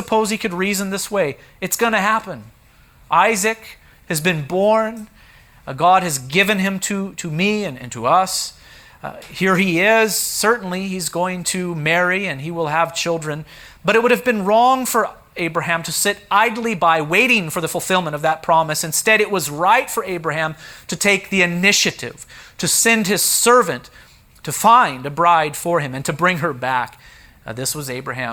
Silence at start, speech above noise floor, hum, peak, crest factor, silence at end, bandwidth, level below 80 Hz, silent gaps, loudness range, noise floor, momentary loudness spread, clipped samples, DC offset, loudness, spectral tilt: 0 s; 31 dB; none; 0 dBFS; 18 dB; 0 s; over 20 kHz; -54 dBFS; none; 4 LU; -49 dBFS; 12 LU; under 0.1%; under 0.1%; -17 LUFS; -3 dB/octave